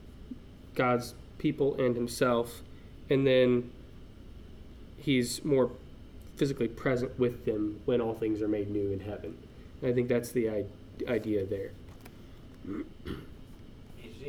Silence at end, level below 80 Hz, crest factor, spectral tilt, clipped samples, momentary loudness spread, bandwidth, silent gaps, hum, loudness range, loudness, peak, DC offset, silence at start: 0 s; -52 dBFS; 18 dB; -6 dB/octave; under 0.1%; 23 LU; 18.5 kHz; none; none; 5 LU; -31 LUFS; -14 dBFS; under 0.1%; 0 s